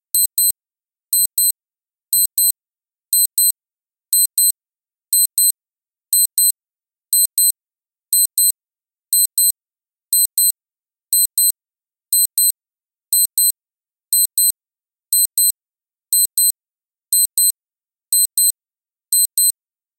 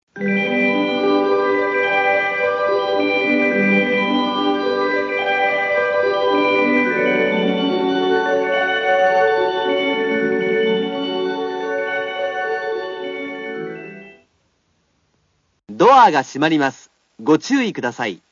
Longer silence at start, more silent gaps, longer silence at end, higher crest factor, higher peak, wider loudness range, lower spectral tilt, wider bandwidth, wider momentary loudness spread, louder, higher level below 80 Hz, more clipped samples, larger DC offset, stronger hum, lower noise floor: about the same, 0.15 s vs 0.15 s; neither; first, 0.45 s vs 0.15 s; about the same, 18 dB vs 16 dB; about the same, 0 dBFS vs -2 dBFS; second, 0 LU vs 8 LU; second, 3.5 dB/octave vs -5 dB/octave; first, 18 kHz vs 7.4 kHz; first, 18 LU vs 8 LU; first, -14 LUFS vs -17 LUFS; about the same, -66 dBFS vs -64 dBFS; neither; neither; neither; first, under -90 dBFS vs -65 dBFS